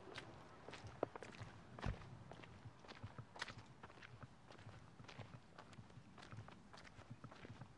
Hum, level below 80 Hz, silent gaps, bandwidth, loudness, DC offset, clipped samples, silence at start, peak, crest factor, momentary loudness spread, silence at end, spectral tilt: none; -66 dBFS; none; 11 kHz; -56 LUFS; under 0.1%; under 0.1%; 0 s; -24 dBFS; 30 dB; 11 LU; 0 s; -5.5 dB/octave